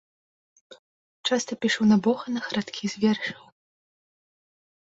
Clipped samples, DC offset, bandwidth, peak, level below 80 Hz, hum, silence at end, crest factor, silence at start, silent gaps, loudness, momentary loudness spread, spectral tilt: under 0.1%; under 0.1%; 8 kHz; -10 dBFS; -68 dBFS; none; 1.5 s; 18 dB; 0.7 s; 0.79-1.24 s; -25 LUFS; 11 LU; -4.5 dB/octave